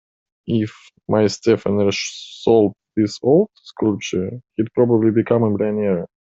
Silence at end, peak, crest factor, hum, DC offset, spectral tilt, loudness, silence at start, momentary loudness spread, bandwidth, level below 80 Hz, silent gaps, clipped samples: 0.25 s; -2 dBFS; 16 dB; none; under 0.1%; -6.5 dB/octave; -19 LUFS; 0.45 s; 10 LU; 7.8 kHz; -58 dBFS; none; under 0.1%